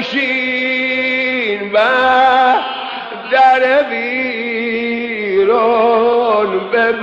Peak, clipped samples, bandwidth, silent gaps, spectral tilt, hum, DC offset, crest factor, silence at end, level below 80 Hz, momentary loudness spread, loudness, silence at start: 0 dBFS; under 0.1%; 7.6 kHz; none; -5 dB/octave; none; under 0.1%; 12 dB; 0 s; -56 dBFS; 8 LU; -13 LUFS; 0 s